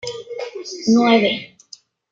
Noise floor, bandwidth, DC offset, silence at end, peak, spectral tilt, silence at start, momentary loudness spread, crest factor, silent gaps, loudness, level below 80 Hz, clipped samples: -46 dBFS; 7.6 kHz; under 0.1%; 0.65 s; -2 dBFS; -4.5 dB/octave; 0.05 s; 16 LU; 16 dB; none; -17 LUFS; -66 dBFS; under 0.1%